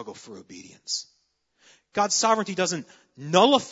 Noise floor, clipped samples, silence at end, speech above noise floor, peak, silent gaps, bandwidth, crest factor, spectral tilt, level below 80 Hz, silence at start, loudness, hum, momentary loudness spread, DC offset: -70 dBFS; under 0.1%; 0 s; 45 dB; -4 dBFS; none; 8 kHz; 22 dB; -3 dB/octave; -72 dBFS; 0 s; -24 LUFS; none; 24 LU; under 0.1%